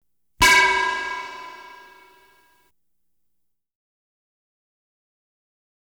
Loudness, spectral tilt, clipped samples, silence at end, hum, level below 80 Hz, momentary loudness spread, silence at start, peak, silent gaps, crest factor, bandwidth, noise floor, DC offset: -17 LUFS; -0.5 dB/octave; under 0.1%; 4.3 s; none; -46 dBFS; 23 LU; 0.4 s; -6 dBFS; none; 22 dB; over 20 kHz; -79 dBFS; under 0.1%